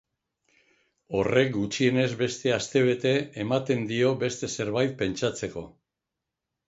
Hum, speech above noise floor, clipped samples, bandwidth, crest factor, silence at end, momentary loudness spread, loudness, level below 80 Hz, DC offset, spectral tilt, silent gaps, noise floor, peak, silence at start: none; 60 dB; under 0.1%; 8 kHz; 20 dB; 1 s; 7 LU; -26 LUFS; -58 dBFS; under 0.1%; -5 dB/octave; none; -86 dBFS; -8 dBFS; 1.1 s